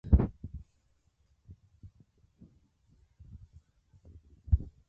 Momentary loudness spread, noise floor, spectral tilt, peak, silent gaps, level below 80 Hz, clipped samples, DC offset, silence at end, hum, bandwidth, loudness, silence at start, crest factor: 29 LU; -72 dBFS; -12 dB/octave; -10 dBFS; none; -38 dBFS; under 0.1%; under 0.1%; 0.25 s; none; 2.5 kHz; -32 LUFS; 0.05 s; 24 dB